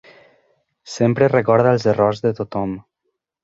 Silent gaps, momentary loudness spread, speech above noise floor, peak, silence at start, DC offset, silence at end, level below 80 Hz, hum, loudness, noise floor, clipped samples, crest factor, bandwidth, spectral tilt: none; 12 LU; 58 dB; -2 dBFS; 0.85 s; under 0.1%; 0.65 s; -54 dBFS; none; -18 LUFS; -75 dBFS; under 0.1%; 18 dB; 8 kHz; -7 dB/octave